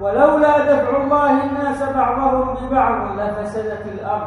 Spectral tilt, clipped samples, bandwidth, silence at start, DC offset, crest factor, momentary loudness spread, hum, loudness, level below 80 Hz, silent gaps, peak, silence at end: -7.5 dB/octave; under 0.1%; 11.5 kHz; 0 s; under 0.1%; 16 dB; 10 LU; none; -17 LUFS; -40 dBFS; none; 0 dBFS; 0 s